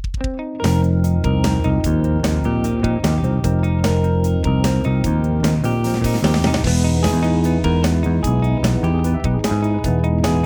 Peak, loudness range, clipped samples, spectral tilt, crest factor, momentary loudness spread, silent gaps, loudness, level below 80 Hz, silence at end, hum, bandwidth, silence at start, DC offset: -4 dBFS; 1 LU; under 0.1%; -7 dB/octave; 14 dB; 2 LU; none; -18 LUFS; -26 dBFS; 0 s; none; over 20 kHz; 0 s; under 0.1%